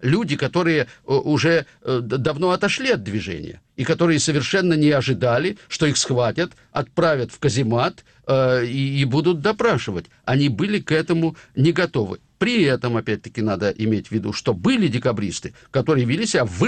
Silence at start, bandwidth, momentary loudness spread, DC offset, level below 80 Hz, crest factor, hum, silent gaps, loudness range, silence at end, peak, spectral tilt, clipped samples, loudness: 0 s; 9.4 kHz; 8 LU; under 0.1%; -52 dBFS; 12 dB; none; none; 2 LU; 0 s; -8 dBFS; -5.5 dB/octave; under 0.1%; -20 LUFS